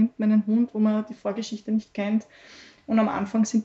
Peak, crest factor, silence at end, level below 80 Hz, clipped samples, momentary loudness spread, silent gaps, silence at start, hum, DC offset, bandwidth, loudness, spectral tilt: -10 dBFS; 14 dB; 0 s; -66 dBFS; under 0.1%; 9 LU; none; 0 s; none; under 0.1%; 7.8 kHz; -25 LUFS; -6.5 dB/octave